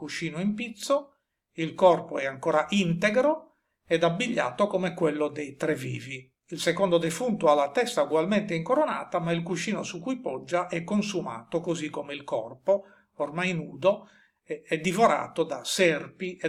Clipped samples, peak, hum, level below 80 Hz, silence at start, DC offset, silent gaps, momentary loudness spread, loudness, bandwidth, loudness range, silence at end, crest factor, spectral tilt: under 0.1%; -8 dBFS; none; -68 dBFS; 0 s; under 0.1%; none; 11 LU; -27 LUFS; 15 kHz; 5 LU; 0 s; 20 dB; -5 dB/octave